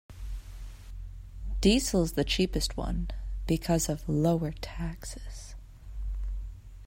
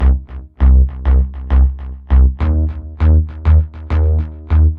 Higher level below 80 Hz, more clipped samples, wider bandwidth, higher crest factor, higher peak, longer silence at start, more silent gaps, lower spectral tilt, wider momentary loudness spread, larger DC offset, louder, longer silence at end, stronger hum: second, -38 dBFS vs -14 dBFS; neither; first, 16 kHz vs 3.4 kHz; first, 20 dB vs 12 dB; second, -10 dBFS vs -2 dBFS; about the same, 0.1 s vs 0 s; neither; second, -5 dB/octave vs -11 dB/octave; first, 20 LU vs 7 LU; neither; second, -30 LUFS vs -15 LUFS; about the same, 0 s vs 0 s; neither